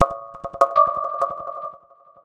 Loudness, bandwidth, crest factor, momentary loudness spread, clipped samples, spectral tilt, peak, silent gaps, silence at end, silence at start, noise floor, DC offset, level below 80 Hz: -21 LUFS; 10.5 kHz; 22 dB; 17 LU; under 0.1%; -6 dB/octave; 0 dBFS; none; 0.45 s; 0 s; -50 dBFS; under 0.1%; -52 dBFS